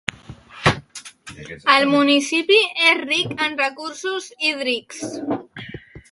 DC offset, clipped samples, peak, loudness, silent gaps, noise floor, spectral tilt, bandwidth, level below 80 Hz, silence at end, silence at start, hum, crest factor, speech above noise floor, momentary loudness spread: under 0.1%; under 0.1%; 0 dBFS; -19 LUFS; none; -41 dBFS; -3.5 dB/octave; 11.5 kHz; -50 dBFS; 0.1 s; 0.3 s; none; 20 dB; 21 dB; 21 LU